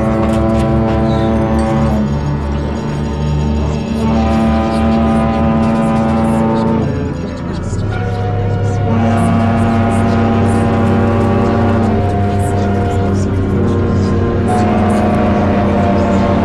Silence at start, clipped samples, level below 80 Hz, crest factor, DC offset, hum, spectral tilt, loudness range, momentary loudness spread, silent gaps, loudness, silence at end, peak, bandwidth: 0 s; under 0.1%; -24 dBFS; 8 dB; under 0.1%; none; -8 dB/octave; 3 LU; 5 LU; none; -14 LUFS; 0 s; -4 dBFS; 11.5 kHz